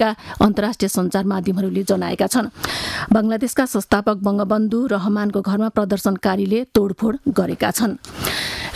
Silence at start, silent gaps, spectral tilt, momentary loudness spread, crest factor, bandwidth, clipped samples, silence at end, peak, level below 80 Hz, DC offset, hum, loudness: 0 s; none; -5 dB/octave; 4 LU; 16 dB; 15.5 kHz; under 0.1%; 0 s; -2 dBFS; -44 dBFS; under 0.1%; none; -19 LUFS